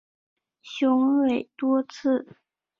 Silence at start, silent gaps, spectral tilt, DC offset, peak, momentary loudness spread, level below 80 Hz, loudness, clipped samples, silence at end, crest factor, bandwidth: 0.65 s; none; -5.5 dB/octave; under 0.1%; -12 dBFS; 7 LU; -70 dBFS; -24 LUFS; under 0.1%; 0.55 s; 12 dB; 7 kHz